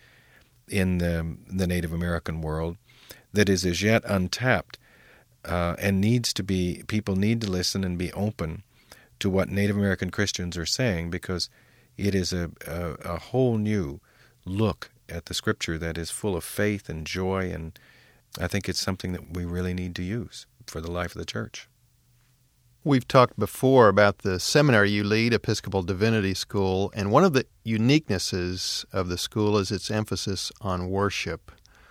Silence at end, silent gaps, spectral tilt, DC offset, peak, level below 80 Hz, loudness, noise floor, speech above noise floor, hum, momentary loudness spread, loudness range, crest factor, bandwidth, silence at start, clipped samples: 0.4 s; none; -5 dB/octave; under 0.1%; -4 dBFS; -48 dBFS; -26 LUFS; -63 dBFS; 38 dB; none; 13 LU; 9 LU; 22 dB; 16.5 kHz; 0.7 s; under 0.1%